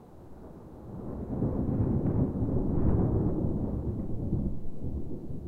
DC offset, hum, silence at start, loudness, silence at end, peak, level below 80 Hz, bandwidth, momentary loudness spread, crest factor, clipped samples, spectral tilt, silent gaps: under 0.1%; none; 0 s; -31 LUFS; 0 s; -12 dBFS; -38 dBFS; 2.6 kHz; 19 LU; 18 dB; under 0.1%; -12.5 dB/octave; none